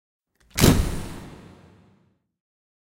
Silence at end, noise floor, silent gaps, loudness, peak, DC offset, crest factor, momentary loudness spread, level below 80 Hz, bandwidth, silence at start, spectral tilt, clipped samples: 1.45 s; -64 dBFS; none; -21 LUFS; 0 dBFS; under 0.1%; 26 dB; 23 LU; -32 dBFS; 16 kHz; 0.55 s; -5 dB/octave; under 0.1%